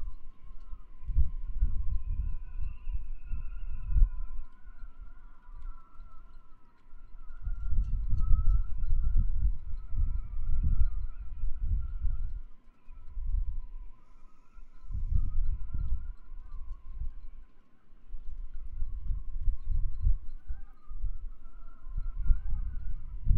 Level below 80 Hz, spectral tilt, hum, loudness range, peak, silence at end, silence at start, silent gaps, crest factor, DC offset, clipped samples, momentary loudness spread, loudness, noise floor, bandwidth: -32 dBFS; -10 dB/octave; none; 9 LU; -8 dBFS; 0 s; 0 s; none; 20 dB; under 0.1%; under 0.1%; 22 LU; -37 LUFS; -49 dBFS; 1.5 kHz